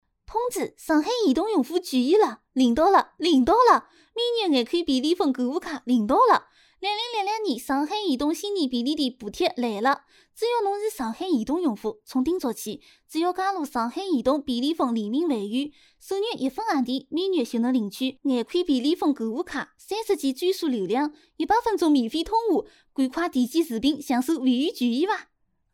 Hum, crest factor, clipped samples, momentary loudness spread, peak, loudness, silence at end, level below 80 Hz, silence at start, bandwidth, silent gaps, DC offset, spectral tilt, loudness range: none; 18 dB; under 0.1%; 10 LU; -6 dBFS; -24 LUFS; 0.5 s; -56 dBFS; 0.3 s; 17 kHz; none; under 0.1%; -4 dB/octave; 5 LU